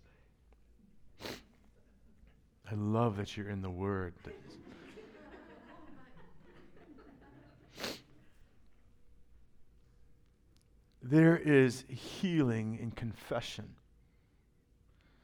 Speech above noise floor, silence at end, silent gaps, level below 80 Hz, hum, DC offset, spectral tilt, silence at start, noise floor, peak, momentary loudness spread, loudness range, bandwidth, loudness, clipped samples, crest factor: 36 dB; 1.5 s; none; -64 dBFS; none; under 0.1%; -7 dB/octave; 1.05 s; -69 dBFS; -14 dBFS; 28 LU; 20 LU; 18 kHz; -33 LUFS; under 0.1%; 24 dB